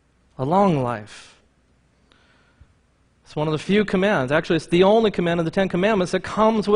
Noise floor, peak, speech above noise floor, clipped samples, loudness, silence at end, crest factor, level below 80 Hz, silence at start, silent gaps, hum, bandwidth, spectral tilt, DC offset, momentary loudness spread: -61 dBFS; -4 dBFS; 41 dB; under 0.1%; -20 LUFS; 0 s; 16 dB; -50 dBFS; 0.4 s; none; none; 10.5 kHz; -6.5 dB/octave; under 0.1%; 11 LU